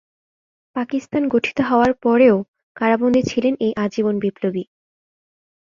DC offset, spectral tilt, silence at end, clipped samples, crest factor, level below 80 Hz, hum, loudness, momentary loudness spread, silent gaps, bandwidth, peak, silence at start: under 0.1%; -6.5 dB/octave; 1.05 s; under 0.1%; 16 dB; -54 dBFS; none; -19 LUFS; 12 LU; 2.48-2.54 s, 2.63-2.75 s; 7.4 kHz; -2 dBFS; 0.75 s